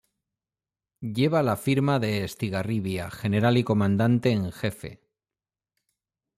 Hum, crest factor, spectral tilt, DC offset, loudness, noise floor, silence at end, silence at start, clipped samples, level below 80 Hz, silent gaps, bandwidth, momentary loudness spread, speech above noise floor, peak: none; 16 dB; -7 dB/octave; under 0.1%; -25 LUFS; under -90 dBFS; 1.4 s; 1 s; under 0.1%; -60 dBFS; none; 15.5 kHz; 10 LU; over 66 dB; -10 dBFS